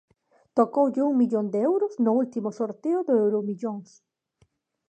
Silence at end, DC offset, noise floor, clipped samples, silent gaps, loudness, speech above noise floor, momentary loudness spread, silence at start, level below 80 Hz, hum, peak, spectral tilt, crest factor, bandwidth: 1.05 s; under 0.1%; -67 dBFS; under 0.1%; none; -25 LUFS; 43 dB; 8 LU; 0.55 s; -80 dBFS; none; -6 dBFS; -9 dB/octave; 18 dB; 8.6 kHz